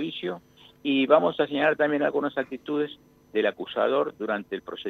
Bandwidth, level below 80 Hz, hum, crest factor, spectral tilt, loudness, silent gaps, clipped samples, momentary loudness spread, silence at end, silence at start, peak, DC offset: 6.4 kHz; -70 dBFS; none; 20 dB; -7 dB/octave; -26 LUFS; none; under 0.1%; 13 LU; 0 s; 0 s; -6 dBFS; under 0.1%